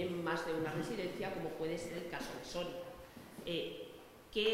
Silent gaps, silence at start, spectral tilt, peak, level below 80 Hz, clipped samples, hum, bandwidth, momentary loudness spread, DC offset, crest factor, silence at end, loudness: none; 0 s; -4.5 dB/octave; -22 dBFS; -64 dBFS; under 0.1%; none; 16 kHz; 13 LU; under 0.1%; 20 dB; 0 s; -41 LUFS